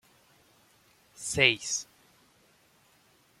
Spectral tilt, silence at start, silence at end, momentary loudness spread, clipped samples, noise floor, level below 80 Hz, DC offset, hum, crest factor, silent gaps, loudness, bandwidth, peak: -1.5 dB/octave; 1.2 s; 1.55 s; 17 LU; under 0.1%; -64 dBFS; -64 dBFS; under 0.1%; none; 30 dB; none; -27 LUFS; 16.5 kHz; -6 dBFS